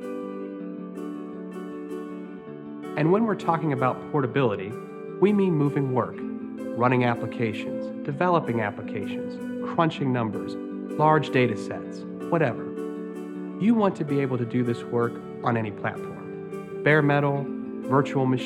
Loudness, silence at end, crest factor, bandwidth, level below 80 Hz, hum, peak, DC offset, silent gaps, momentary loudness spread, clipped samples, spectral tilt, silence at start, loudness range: -26 LUFS; 0 s; 20 dB; 12 kHz; -68 dBFS; none; -6 dBFS; under 0.1%; none; 14 LU; under 0.1%; -8 dB/octave; 0 s; 2 LU